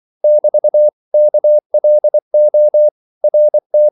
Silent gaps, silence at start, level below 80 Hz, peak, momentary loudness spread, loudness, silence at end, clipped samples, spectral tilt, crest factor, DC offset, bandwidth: 0.93-1.11 s, 1.66-1.70 s, 2.22-2.31 s, 2.91-3.21 s, 3.66-3.70 s; 0.25 s; -82 dBFS; -4 dBFS; 3 LU; -12 LUFS; 0 s; under 0.1%; -11 dB/octave; 6 dB; under 0.1%; 0.9 kHz